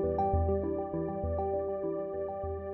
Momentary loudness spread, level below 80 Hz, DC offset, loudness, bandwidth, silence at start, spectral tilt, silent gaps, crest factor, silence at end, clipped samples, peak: 7 LU; -44 dBFS; under 0.1%; -33 LUFS; 3.1 kHz; 0 s; -11 dB/octave; none; 14 dB; 0 s; under 0.1%; -18 dBFS